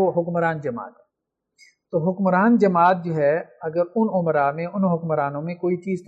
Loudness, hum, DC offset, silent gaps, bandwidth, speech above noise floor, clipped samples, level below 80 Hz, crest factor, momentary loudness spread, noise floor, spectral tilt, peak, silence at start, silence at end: -21 LUFS; none; under 0.1%; none; 7.8 kHz; 60 dB; under 0.1%; -70 dBFS; 16 dB; 11 LU; -81 dBFS; -9.5 dB/octave; -4 dBFS; 0 s; 0.05 s